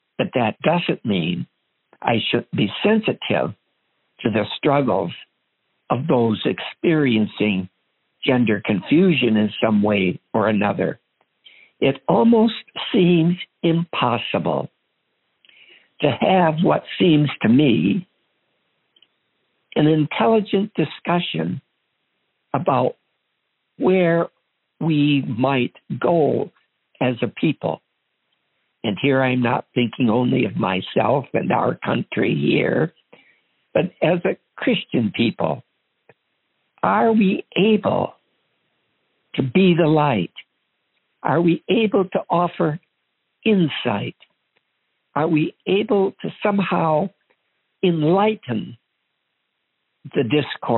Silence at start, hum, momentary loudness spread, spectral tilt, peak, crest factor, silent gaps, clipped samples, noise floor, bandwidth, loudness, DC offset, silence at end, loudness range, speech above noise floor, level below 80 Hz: 0.2 s; none; 10 LU; -5 dB/octave; -2 dBFS; 18 dB; none; under 0.1%; -74 dBFS; 4.2 kHz; -20 LUFS; under 0.1%; 0 s; 4 LU; 55 dB; -64 dBFS